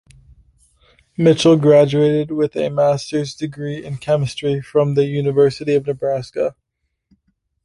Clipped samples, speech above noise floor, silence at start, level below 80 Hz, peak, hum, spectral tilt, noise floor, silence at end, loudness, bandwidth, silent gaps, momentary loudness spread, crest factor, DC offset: under 0.1%; 50 dB; 1.2 s; -54 dBFS; -2 dBFS; none; -6.5 dB/octave; -67 dBFS; 1.15 s; -17 LUFS; 11.5 kHz; none; 13 LU; 16 dB; under 0.1%